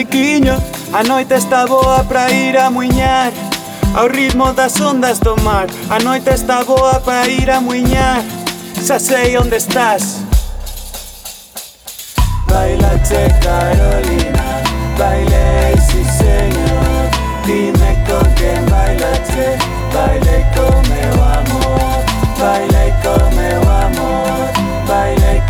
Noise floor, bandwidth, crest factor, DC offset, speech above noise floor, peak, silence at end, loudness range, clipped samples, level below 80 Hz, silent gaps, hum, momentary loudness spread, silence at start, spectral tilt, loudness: -32 dBFS; over 20 kHz; 12 dB; under 0.1%; 21 dB; 0 dBFS; 0 s; 3 LU; under 0.1%; -16 dBFS; none; none; 6 LU; 0 s; -5 dB/octave; -13 LUFS